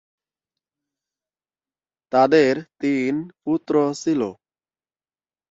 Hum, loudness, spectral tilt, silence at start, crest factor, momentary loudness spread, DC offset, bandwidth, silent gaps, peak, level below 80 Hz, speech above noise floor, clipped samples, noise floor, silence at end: none; -21 LUFS; -6 dB/octave; 2.1 s; 20 dB; 10 LU; under 0.1%; 7.8 kHz; none; -4 dBFS; -68 dBFS; over 70 dB; under 0.1%; under -90 dBFS; 1.15 s